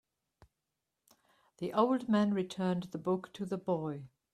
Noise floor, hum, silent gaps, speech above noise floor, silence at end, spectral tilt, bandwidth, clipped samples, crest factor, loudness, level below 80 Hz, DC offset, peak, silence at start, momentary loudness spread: -87 dBFS; none; none; 54 dB; 0.25 s; -7.5 dB/octave; 12.5 kHz; under 0.1%; 20 dB; -34 LUFS; -74 dBFS; under 0.1%; -14 dBFS; 1.6 s; 11 LU